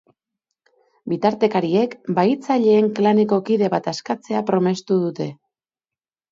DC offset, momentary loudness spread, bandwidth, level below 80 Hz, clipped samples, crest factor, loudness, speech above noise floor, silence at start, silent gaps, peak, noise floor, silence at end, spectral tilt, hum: under 0.1%; 10 LU; 7.6 kHz; -68 dBFS; under 0.1%; 16 dB; -19 LUFS; over 71 dB; 1.05 s; none; -4 dBFS; under -90 dBFS; 1 s; -7 dB/octave; none